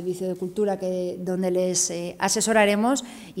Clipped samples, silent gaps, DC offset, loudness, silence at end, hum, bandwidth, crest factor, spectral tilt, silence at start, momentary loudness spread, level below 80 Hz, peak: under 0.1%; none; under 0.1%; -24 LUFS; 0 s; none; 16 kHz; 18 dB; -3.5 dB/octave; 0 s; 10 LU; -62 dBFS; -8 dBFS